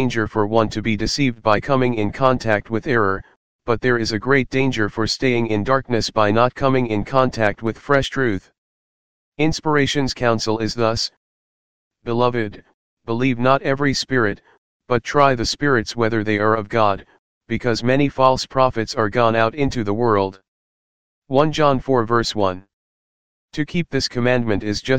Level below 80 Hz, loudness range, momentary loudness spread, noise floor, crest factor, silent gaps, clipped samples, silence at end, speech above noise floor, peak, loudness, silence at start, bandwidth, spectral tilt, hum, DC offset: -42 dBFS; 3 LU; 7 LU; under -90 dBFS; 18 dB; 3.36-3.59 s, 8.58-9.32 s, 11.17-11.91 s, 12.74-12.97 s, 14.58-14.80 s, 17.19-17.41 s, 20.48-21.22 s, 22.73-23.48 s; under 0.1%; 0 s; over 71 dB; 0 dBFS; -19 LUFS; 0 s; 9.8 kHz; -5.5 dB/octave; none; 2%